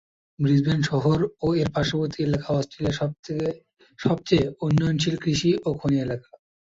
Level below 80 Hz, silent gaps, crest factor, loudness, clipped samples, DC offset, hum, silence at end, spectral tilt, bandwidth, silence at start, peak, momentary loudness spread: -48 dBFS; 3.19-3.23 s; 18 dB; -24 LUFS; under 0.1%; under 0.1%; none; 0.45 s; -6.5 dB/octave; 7.8 kHz; 0.4 s; -6 dBFS; 7 LU